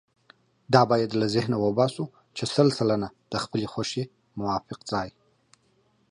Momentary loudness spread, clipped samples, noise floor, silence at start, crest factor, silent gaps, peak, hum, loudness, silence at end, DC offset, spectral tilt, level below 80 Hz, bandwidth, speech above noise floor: 12 LU; under 0.1%; -66 dBFS; 0.7 s; 24 dB; none; -4 dBFS; none; -26 LUFS; 1 s; under 0.1%; -6 dB/octave; -60 dBFS; 11.5 kHz; 41 dB